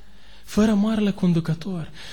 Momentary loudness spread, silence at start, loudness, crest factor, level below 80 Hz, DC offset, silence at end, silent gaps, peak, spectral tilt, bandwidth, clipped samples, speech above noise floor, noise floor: 11 LU; 0.5 s; -22 LUFS; 14 dB; -46 dBFS; 1%; 0 s; none; -8 dBFS; -7 dB/octave; 18 kHz; under 0.1%; 27 dB; -48 dBFS